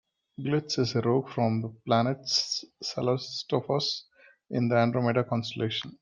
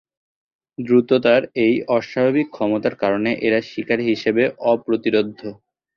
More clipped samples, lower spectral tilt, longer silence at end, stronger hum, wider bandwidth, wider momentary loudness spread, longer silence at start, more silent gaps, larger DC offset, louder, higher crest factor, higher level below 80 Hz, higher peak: neither; second, -5.5 dB/octave vs -7 dB/octave; second, 0.1 s vs 0.45 s; neither; first, 9 kHz vs 6.8 kHz; about the same, 7 LU vs 7 LU; second, 0.4 s vs 0.8 s; neither; neither; second, -28 LUFS vs -19 LUFS; about the same, 18 dB vs 18 dB; second, -68 dBFS vs -60 dBFS; second, -10 dBFS vs -2 dBFS